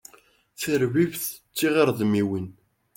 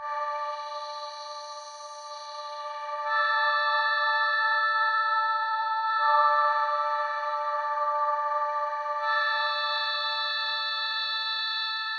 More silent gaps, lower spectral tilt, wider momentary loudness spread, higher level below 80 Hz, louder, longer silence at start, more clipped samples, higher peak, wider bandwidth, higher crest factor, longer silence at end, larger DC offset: neither; first, -5.5 dB/octave vs 4 dB/octave; second, 11 LU vs 14 LU; first, -64 dBFS vs under -90 dBFS; about the same, -24 LUFS vs -26 LUFS; first, 0.6 s vs 0 s; neither; about the same, -8 dBFS vs -10 dBFS; first, 17 kHz vs 10 kHz; about the same, 18 dB vs 16 dB; first, 0.45 s vs 0 s; neither